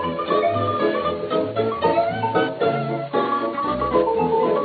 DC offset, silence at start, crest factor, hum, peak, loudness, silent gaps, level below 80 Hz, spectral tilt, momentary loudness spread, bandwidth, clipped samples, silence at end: under 0.1%; 0 s; 16 dB; none; -6 dBFS; -21 LUFS; none; -50 dBFS; -9.5 dB/octave; 4 LU; 4.8 kHz; under 0.1%; 0 s